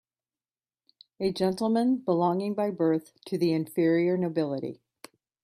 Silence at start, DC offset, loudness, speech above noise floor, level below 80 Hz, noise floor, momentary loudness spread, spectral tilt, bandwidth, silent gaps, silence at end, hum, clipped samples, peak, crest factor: 1.2 s; under 0.1%; -27 LUFS; over 64 dB; -70 dBFS; under -90 dBFS; 8 LU; -7.5 dB/octave; 13.5 kHz; none; 0.7 s; none; under 0.1%; -12 dBFS; 16 dB